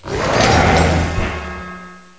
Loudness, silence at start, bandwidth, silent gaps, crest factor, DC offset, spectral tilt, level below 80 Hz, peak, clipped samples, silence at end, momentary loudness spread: -15 LUFS; 0.05 s; 8 kHz; none; 16 dB; 0.4%; -5 dB/octave; -24 dBFS; 0 dBFS; under 0.1%; 0.2 s; 18 LU